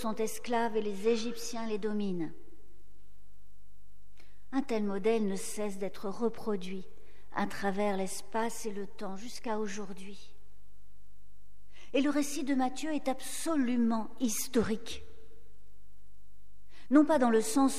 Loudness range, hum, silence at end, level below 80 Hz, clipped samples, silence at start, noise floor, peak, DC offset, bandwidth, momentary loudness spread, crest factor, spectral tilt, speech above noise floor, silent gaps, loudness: 8 LU; none; 0 s; -62 dBFS; under 0.1%; 0 s; -63 dBFS; -12 dBFS; 2%; 15.5 kHz; 14 LU; 22 dB; -4.5 dB/octave; 31 dB; none; -33 LUFS